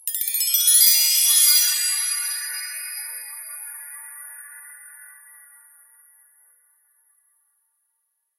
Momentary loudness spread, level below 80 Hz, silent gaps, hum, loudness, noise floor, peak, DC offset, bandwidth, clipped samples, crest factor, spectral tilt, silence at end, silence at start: 24 LU; under -90 dBFS; none; none; -16 LUFS; -74 dBFS; -2 dBFS; under 0.1%; 17 kHz; under 0.1%; 22 dB; 11.5 dB/octave; 3.35 s; 0.05 s